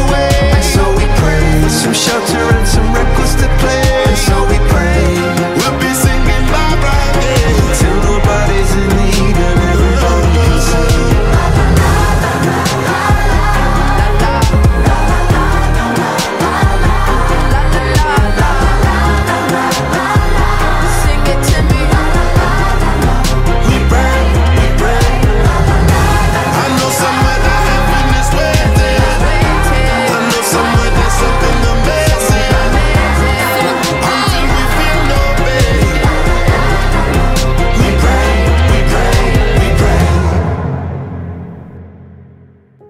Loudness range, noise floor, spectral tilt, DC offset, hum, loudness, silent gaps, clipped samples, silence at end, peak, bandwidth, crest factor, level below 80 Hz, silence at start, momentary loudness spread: 1 LU; -41 dBFS; -5 dB/octave; under 0.1%; none; -11 LUFS; none; under 0.1%; 0.65 s; 0 dBFS; 16 kHz; 10 dB; -14 dBFS; 0 s; 2 LU